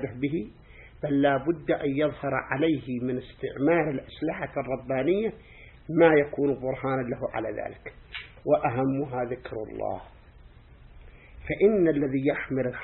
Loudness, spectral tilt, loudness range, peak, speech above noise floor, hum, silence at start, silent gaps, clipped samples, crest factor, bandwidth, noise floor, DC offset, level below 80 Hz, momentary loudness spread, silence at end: -27 LUFS; -11 dB/octave; 5 LU; -6 dBFS; 25 dB; none; 0 s; none; under 0.1%; 20 dB; 4.2 kHz; -51 dBFS; under 0.1%; -52 dBFS; 14 LU; 0 s